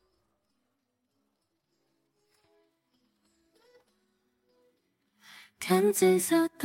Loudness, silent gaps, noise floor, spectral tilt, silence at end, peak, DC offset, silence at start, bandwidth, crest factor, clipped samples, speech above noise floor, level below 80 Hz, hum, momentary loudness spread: -26 LUFS; none; -80 dBFS; -4.5 dB/octave; 0 s; -12 dBFS; under 0.1%; 5.6 s; 16.5 kHz; 22 dB; under 0.1%; 55 dB; -80 dBFS; none; 6 LU